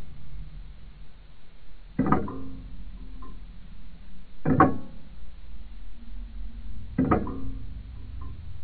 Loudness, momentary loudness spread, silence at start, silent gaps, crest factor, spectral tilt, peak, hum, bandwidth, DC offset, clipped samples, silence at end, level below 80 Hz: -28 LUFS; 25 LU; 0 s; none; 26 dB; -11.5 dB/octave; -2 dBFS; none; 4.7 kHz; under 0.1%; under 0.1%; 0 s; -42 dBFS